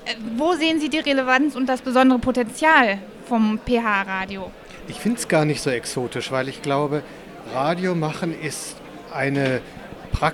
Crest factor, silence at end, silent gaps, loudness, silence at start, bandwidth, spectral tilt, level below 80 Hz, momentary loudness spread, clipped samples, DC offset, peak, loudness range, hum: 20 dB; 0 s; none; -21 LUFS; 0 s; 15.5 kHz; -5 dB/octave; -44 dBFS; 16 LU; under 0.1%; under 0.1%; -2 dBFS; 6 LU; none